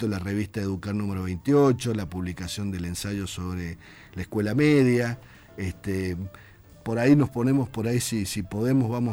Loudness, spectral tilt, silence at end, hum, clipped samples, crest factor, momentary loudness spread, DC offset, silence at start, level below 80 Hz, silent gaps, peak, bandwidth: -26 LUFS; -6.5 dB/octave; 0 s; none; under 0.1%; 18 dB; 15 LU; under 0.1%; 0 s; -50 dBFS; none; -8 dBFS; over 20 kHz